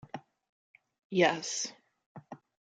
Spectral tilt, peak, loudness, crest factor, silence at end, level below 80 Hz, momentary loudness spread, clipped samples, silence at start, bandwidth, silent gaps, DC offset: -3.5 dB/octave; -12 dBFS; -31 LUFS; 24 dB; 0.35 s; -80 dBFS; 24 LU; under 0.1%; 0.15 s; 9.4 kHz; 0.49-0.74 s, 0.99-1.10 s, 2.06-2.15 s; under 0.1%